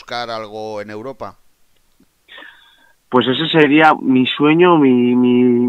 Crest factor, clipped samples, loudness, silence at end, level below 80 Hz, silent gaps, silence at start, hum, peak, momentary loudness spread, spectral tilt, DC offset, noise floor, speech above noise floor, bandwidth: 16 dB; under 0.1%; -13 LUFS; 0 s; -60 dBFS; none; 0.1 s; none; 0 dBFS; 19 LU; -7 dB/octave; under 0.1%; -56 dBFS; 43 dB; 6.8 kHz